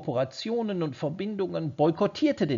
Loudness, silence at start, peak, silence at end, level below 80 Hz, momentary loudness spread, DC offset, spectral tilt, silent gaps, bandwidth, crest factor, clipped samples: -28 LUFS; 0 s; -12 dBFS; 0 s; -68 dBFS; 6 LU; under 0.1%; -6 dB/octave; none; 7.4 kHz; 16 dB; under 0.1%